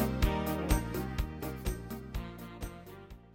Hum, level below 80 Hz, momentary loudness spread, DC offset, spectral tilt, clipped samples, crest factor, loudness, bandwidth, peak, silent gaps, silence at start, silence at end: none; -38 dBFS; 14 LU; under 0.1%; -6 dB/octave; under 0.1%; 22 dB; -36 LUFS; 17 kHz; -12 dBFS; none; 0 s; 0 s